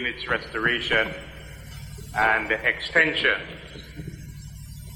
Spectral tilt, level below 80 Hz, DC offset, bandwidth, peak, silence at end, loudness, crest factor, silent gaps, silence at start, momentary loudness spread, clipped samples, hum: -4 dB/octave; -46 dBFS; under 0.1%; 17 kHz; -6 dBFS; 0 s; -23 LUFS; 22 dB; none; 0 s; 21 LU; under 0.1%; 50 Hz at -45 dBFS